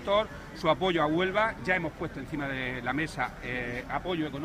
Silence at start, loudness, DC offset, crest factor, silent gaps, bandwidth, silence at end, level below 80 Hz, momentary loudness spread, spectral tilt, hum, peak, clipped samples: 0 s; -30 LUFS; under 0.1%; 18 dB; none; 15.5 kHz; 0 s; -50 dBFS; 9 LU; -6 dB/octave; none; -12 dBFS; under 0.1%